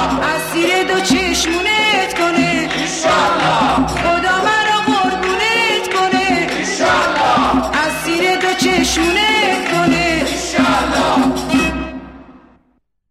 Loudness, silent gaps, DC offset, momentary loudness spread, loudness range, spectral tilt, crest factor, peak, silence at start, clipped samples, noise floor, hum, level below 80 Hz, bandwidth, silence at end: -14 LUFS; none; under 0.1%; 4 LU; 1 LU; -3 dB/octave; 14 dB; -2 dBFS; 0 s; under 0.1%; -60 dBFS; none; -36 dBFS; 15.5 kHz; 0.75 s